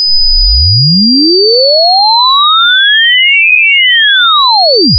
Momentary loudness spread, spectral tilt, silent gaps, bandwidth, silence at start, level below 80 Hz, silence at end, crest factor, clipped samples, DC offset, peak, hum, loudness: 2 LU; -9.5 dB/octave; none; 5.4 kHz; 0 s; -20 dBFS; 0 s; 6 dB; under 0.1%; under 0.1%; 0 dBFS; none; -4 LUFS